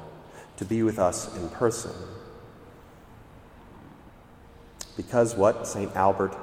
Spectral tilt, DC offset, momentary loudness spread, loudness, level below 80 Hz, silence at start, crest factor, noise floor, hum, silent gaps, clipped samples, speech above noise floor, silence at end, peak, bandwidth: -5.5 dB/octave; under 0.1%; 23 LU; -26 LUFS; -54 dBFS; 0 s; 20 dB; -50 dBFS; none; none; under 0.1%; 25 dB; 0 s; -8 dBFS; 16 kHz